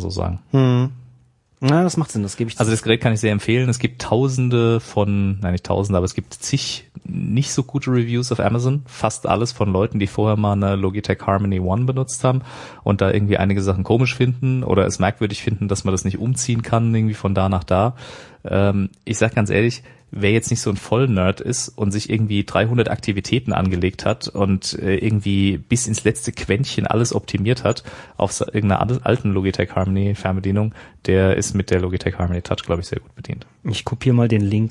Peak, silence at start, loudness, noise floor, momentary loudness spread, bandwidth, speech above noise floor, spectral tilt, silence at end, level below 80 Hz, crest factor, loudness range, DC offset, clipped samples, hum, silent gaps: -2 dBFS; 0 s; -20 LUFS; -54 dBFS; 7 LU; 11.5 kHz; 35 dB; -6 dB/octave; 0 s; -46 dBFS; 18 dB; 2 LU; under 0.1%; under 0.1%; none; none